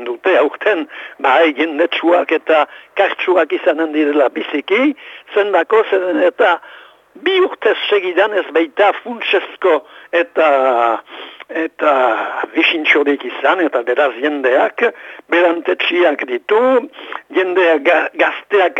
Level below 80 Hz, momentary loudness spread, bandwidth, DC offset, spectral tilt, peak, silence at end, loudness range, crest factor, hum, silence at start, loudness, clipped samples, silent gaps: -72 dBFS; 8 LU; 7.8 kHz; under 0.1%; -4 dB/octave; 0 dBFS; 0 s; 1 LU; 14 dB; none; 0 s; -15 LUFS; under 0.1%; none